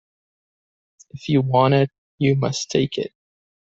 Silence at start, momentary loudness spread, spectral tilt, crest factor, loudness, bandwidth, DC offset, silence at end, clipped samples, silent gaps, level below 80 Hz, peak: 1.15 s; 12 LU; -6 dB/octave; 18 dB; -20 LUFS; 7.8 kHz; under 0.1%; 0.65 s; under 0.1%; 1.98-2.18 s; -58 dBFS; -4 dBFS